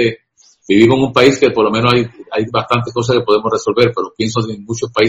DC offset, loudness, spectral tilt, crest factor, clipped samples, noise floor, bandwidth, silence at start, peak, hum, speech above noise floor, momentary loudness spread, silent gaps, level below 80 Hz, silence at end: under 0.1%; -14 LUFS; -5.5 dB/octave; 14 dB; 0.3%; -51 dBFS; 10.5 kHz; 0 s; 0 dBFS; none; 38 dB; 10 LU; none; -46 dBFS; 0 s